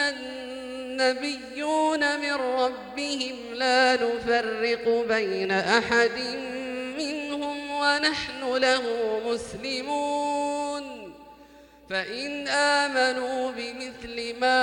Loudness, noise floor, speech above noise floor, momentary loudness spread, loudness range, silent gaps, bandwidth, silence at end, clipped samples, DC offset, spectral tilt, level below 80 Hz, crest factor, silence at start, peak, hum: -26 LUFS; -51 dBFS; 26 dB; 12 LU; 4 LU; none; 17 kHz; 0 s; under 0.1%; under 0.1%; -2.5 dB/octave; -60 dBFS; 20 dB; 0 s; -6 dBFS; none